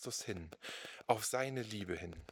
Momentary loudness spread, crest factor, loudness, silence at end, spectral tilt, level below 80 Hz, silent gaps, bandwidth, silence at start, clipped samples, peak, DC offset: 11 LU; 26 dB; -40 LUFS; 0 s; -3.5 dB/octave; -66 dBFS; none; over 20 kHz; 0 s; under 0.1%; -16 dBFS; under 0.1%